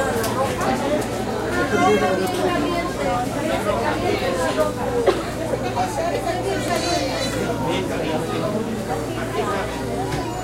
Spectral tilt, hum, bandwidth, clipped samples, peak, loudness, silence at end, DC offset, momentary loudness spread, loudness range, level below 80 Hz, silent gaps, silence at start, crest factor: -5 dB/octave; none; 16 kHz; under 0.1%; -4 dBFS; -22 LUFS; 0 s; 0.1%; 5 LU; 2 LU; -40 dBFS; none; 0 s; 18 dB